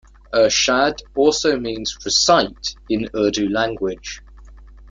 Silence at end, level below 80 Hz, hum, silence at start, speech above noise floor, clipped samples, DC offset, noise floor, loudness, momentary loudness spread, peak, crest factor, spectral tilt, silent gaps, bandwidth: 0 s; -44 dBFS; none; 0.3 s; 23 dB; under 0.1%; under 0.1%; -41 dBFS; -18 LUFS; 11 LU; -2 dBFS; 18 dB; -2.5 dB/octave; none; 9.4 kHz